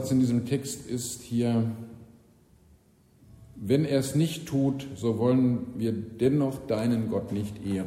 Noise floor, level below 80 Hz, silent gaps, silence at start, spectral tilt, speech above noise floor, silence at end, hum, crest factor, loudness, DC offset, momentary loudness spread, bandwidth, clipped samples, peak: -60 dBFS; -58 dBFS; none; 0 s; -6.5 dB/octave; 33 dB; 0 s; none; 16 dB; -28 LUFS; under 0.1%; 8 LU; 16 kHz; under 0.1%; -10 dBFS